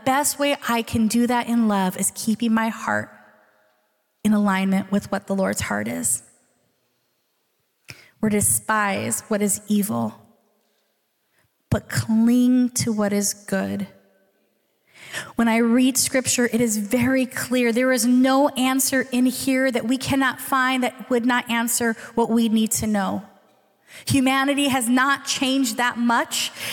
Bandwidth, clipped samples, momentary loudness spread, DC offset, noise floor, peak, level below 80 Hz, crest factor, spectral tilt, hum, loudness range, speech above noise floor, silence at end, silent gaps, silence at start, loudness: 18 kHz; under 0.1%; 7 LU; under 0.1%; -70 dBFS; -8 dBFS; -56 dBFS; 14 dB; -3.5 dB/octave; none; 5 LU; 49 dB; 0 s; none; 0.05 s; -21 LUFS